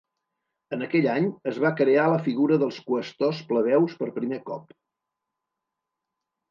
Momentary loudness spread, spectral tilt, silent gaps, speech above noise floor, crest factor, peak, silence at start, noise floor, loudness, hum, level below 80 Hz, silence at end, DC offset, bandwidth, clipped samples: 12 LU; -8 dB/octave; none; 61 dB; 16 dB; -10 dBFS; 0.7 s; -85 dBFS; -24 LUFS; none; -78 dBFS; 1.9 s; under 0.1%; 7.2 kHz; under 0.1%